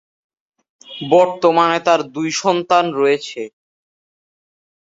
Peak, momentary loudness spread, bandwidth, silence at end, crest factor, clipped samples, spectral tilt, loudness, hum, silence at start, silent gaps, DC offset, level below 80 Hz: 0 dBFS; 16 LU; 8 kHz; 1.4 s; 18 dB; under 0.1%; -4 dB/octave; -16 LUFS; none; 0.9 s; none; under 0.1%; -66 dBFS